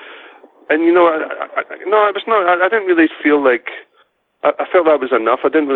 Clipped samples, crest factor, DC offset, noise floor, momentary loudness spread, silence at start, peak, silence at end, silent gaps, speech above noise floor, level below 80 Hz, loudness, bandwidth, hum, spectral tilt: under 0.1%; 14 dB; under 0.1%; -57 dBFS; 9 LU; 0 s; -2 dBFS; 0 s; none; 43 dB; -64 dBFS; -14 LUFS; 4.2 kHz; none; -7 dB/octave